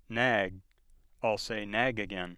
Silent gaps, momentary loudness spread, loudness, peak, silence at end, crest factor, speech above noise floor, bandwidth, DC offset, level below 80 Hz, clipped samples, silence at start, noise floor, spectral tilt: none; 8 LU; -31 LUFS; -12 dBFS; 0 s; 22 dB; 31 dB; 13.5 kHz; under 0.1%; -56 dBFS; under 0.1%; 0.1 s; -62 dBFS; -4.5 dB/octave